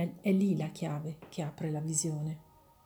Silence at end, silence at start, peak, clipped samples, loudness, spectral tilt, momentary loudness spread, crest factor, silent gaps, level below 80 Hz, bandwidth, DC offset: 0.45 s; 0 s; -18 dBFS; under 0.1%; -34 LUFS; -6 dB/octave; 11 LU; 16 dB; none; -70 dBFS; over 20 kHz; under 0.1%